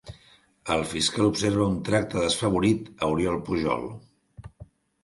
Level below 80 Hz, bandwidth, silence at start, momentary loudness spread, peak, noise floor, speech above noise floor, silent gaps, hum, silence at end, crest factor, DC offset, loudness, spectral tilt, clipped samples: -48 dBFS; 11.5 kHz; 0.05 s; 11 LU; -10 dBFS; -58 dBFS; 33 dB; none; none; 0.4 s; 18 dB; under 0.1%; -25 LUFS; -5 dB/octave; under 0.1%